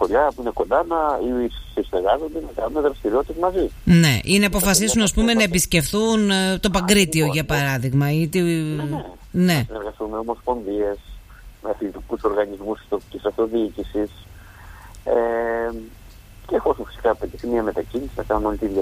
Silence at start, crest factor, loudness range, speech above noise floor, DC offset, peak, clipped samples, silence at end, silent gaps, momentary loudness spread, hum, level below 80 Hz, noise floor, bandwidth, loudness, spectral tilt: 0 s; 20 dB; 8 LU; 22 dB; under 0.1%; -2 dBFS; under 0.1%; 0 s; none; 12 LU; none; -38 dBFS; -42 dBFS; 15.5 kHz; -21 LUFS; -4.5 dB/octave